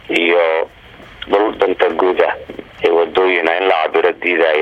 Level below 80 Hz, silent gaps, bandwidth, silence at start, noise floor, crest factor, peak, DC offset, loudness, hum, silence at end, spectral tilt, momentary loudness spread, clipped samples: -50 dBFS; none; 8.6 kHz; 0.05 s; -39 dBFS; 14 dB; 0 dBFS; under 0.1%; -15 LUFS; none; 0 s; -5 dB/octave; 7 LU; under 0.1%